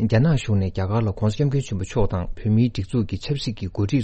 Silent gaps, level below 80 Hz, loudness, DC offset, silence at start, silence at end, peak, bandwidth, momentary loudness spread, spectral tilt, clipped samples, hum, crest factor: none; -36 dBFS; -23 LUFS; under 0.1%; 0 s; 0 s; -6 dBFS; 8.6 kHz; 7 LU; -7.5 dB/octave; under 0.1%; none; 16 dB